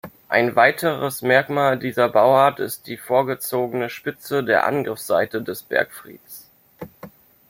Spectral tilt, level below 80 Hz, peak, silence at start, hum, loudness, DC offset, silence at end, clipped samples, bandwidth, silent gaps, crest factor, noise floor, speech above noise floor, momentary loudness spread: -5 dB/octave; -64 dBFS; -2 dBFS; 0.05 s; none; -20 LUFS; under 0.1%; 0.4 s; under 0.1%; 16.5 kHz; none; 20 dB; -44 dBFS; 24 dB; 23 LU